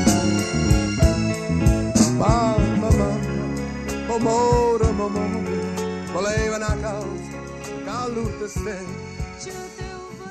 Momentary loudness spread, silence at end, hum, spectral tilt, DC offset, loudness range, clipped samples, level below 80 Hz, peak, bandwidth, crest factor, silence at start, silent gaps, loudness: 15 LU; 0 s; none; -5.5 dB/octave; under 0.1%; 9 LU; under 0.1%; -30 dBFS; -4 dBFS; 14 kHz; 18 dB; 0 s; none; -22 LUFS